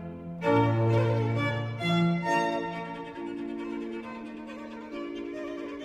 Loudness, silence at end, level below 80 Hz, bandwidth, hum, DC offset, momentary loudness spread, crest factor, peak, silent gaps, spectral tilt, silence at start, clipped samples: -29 LUFS; 0 s; -60 dBFS; 9.4 kHz; none; under 0.1%; 15 LU; 18 dB; -12 dBFS; none; -7 dB/octave; 0 s; under 0.1%